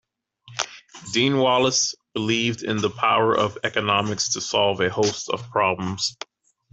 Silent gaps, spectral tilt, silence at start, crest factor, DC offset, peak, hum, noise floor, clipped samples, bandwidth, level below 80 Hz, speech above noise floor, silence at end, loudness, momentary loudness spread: none; -3 dB/octave; 0.45 s; 20 dB; under 0.1%; -2 dBFS; none; -51 dBFS; under 0.1%; 8.4 kHz; -62 dBFS; 29 dB; 0.6 s; -22 LUFS; 11 LU